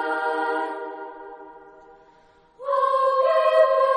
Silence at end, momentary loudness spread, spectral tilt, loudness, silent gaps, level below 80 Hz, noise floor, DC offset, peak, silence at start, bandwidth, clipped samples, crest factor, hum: 0 s; 21 LU; -2.5 dB/octave; -21 LUFS; none; -70 dBFS; -55 dBFS; under 0.1%; -6 dBFS; 0 s; 10 kHz; under 0.1%; 18 dB; none